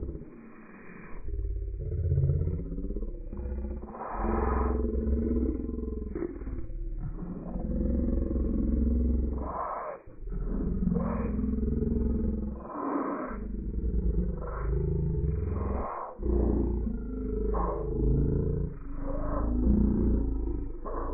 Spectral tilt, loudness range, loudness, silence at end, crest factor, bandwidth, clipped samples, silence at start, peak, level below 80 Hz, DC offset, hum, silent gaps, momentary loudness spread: -8.5 dB/octave; 4 LU; -32 LUFS; 0 s; 18 dB; 2.6 kHz; under 0.1%; 0 s; -12 dBFS; -32 dBFS; under 0.1%; none; none; 12 LU